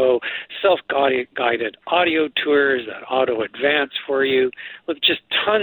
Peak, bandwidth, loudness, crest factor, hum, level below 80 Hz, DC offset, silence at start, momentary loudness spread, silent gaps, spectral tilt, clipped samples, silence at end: -2 dBFS; 19 kHz; -20 LUFS; 16 dB; none; -62 dBFS; under 0.1%; 0 s; 7 LU; none; -8 dB/octave; under 0.1%; 0 s